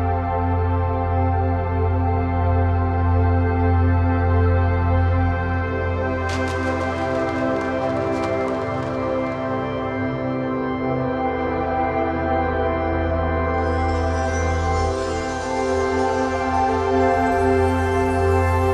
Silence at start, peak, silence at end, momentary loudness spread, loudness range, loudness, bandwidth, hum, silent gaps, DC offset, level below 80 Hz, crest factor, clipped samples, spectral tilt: 0 s; -6 dBFS; 0 s; 5 LU; 4 LU; -21 LUFS; 9.4 kHz; none; none; under 0.1%; -32 dBFS; 14 dB; under 0.1%; -7.5 dB/octave